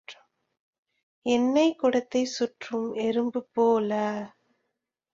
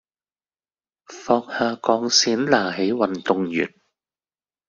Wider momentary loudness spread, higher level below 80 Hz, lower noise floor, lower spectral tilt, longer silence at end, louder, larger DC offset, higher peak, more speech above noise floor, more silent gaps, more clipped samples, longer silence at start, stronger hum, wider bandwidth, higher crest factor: first, 11 LU vs 8 LU; second, -70 dBFS vs -64 dBFS; second, -82 dBFS vs under -90 dBFS; first, -4.5 dB/octave vs -3 dB/octave; second, 0.85 s vs 1 s; second, -26 LUFS vs -21 LUFS; neither; second, -10 dBFS vs -2 dBFS; second, 57 dB vs over 69 dB; first, 0.60-0.73 s, 0.79-0.83 s, 1.03-1.22 s vs none; neither; second, 0.1 s vs 1.1 s; neither; about the same, 7.8 kHz vs 7.6 kHz; second, 16 dB vs 22 dB